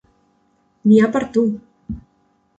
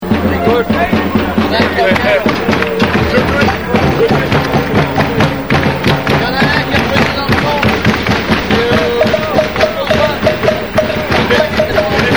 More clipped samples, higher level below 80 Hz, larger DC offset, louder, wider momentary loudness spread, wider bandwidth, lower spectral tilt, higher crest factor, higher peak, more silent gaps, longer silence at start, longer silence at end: neither; second, -48 dBFS vs -30 dBFS; second, under 0.1% vs 1%; second, -17 LUFS vs -12 LUFS; first, 20 LU vs 2 LU; second, 8 kHz vs over 20 kHz; first, -8 dB/octave vs -6 dB/octave; first, 18 dB vs 12 dB; about the same, -2 dBFS vs 0 dBFS; neither; first, 0.85 s vs 0 s; first, 0.6 s vs 0 s